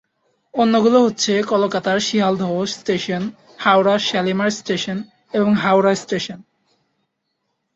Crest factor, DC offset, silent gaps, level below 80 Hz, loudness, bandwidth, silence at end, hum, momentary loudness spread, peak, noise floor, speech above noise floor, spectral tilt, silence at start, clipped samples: 18 dB; under 0.1%; none; -60 dBFS; -18 LUFS; 8 kHz; 1.35 s; none; 11 LU; -2 dBFS; -73 dBFS; 56 dB; -4.5 dB/octave; 0.55 s; under 0.1%